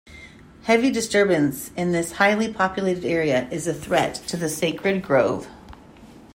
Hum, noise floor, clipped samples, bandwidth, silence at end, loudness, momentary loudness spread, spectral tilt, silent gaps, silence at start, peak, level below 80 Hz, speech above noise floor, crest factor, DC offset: none; -46 dBFS; under 0.1%; 16 kHz; 0.1 s; -22 LUFS; 8 LU; -4.5 dB/octave; none; 0.1 s; -4 dBFS; -52 dBFS; 24 dB; 18 dB; under 0.1%